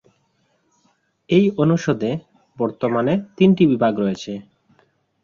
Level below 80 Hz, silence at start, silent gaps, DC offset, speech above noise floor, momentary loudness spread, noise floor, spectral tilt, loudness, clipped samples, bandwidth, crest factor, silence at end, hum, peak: -58 dBFS; 1.3 s; none; under 0.1%; 47 dB; 13 LU; -65 dBFS; -7.5 dB/octave; -19 LUFS; under 0.1%; 7.2 kHz; 18 dB; 0.85 s; none; -2 dBFS